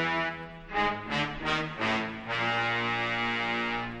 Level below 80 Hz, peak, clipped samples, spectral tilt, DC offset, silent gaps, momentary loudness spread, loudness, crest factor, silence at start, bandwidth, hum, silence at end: -52 dBFS; -14 dBFS; under 0.1%; -4.5 dB/octave; under 0.1%; none; 5 LU; -29 LUFS; 18 dB; 0 s; 10 kHz; none; 0 s